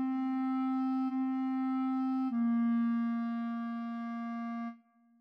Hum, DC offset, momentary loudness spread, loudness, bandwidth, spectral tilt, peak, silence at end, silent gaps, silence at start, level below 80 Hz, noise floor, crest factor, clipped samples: none; under 0.1%; 8 LU; -34 LUFS; 5.2 kHz; -8 dB/octave; -24 dBFS; 0.45 s; none; 0 s; under -90 dBFS; -57 dBFS; 8 dB; under 0.1%